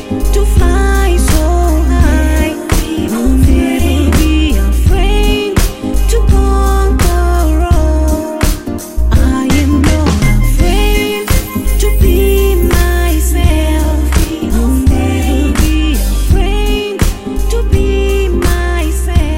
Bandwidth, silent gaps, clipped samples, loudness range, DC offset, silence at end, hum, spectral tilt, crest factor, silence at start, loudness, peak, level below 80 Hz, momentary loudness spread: 16.5 kHz; none; under 0.1%; 2 LU; 2%; 0 s; none; -5.5 dB/octave; 10 dB; 0 s; -12 LUFS; 0 dBFS; -12 dBFS; 4 LU